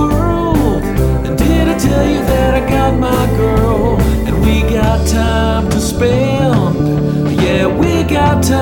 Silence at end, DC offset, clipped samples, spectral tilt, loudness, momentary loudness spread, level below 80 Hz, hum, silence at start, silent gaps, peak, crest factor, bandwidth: 0 s; under 0.1%; under 0.1%; -6.5 dB/octave; -13 LUFS; 2 LU; -18 dBFS; none; 0 s; none; 0 dBFS; 12 dB; 19 kHz